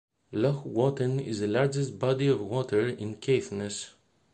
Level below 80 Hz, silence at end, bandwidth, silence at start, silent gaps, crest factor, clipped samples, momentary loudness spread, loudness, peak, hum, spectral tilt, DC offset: -62 dBFS; 0.45 s; 9.4 kHz; 0.3 s; none; 18 dB; under 0.1%; 8 LU; -29 LUFS; -12 dBFS; none; -6.5 dB/octave; under 0.1%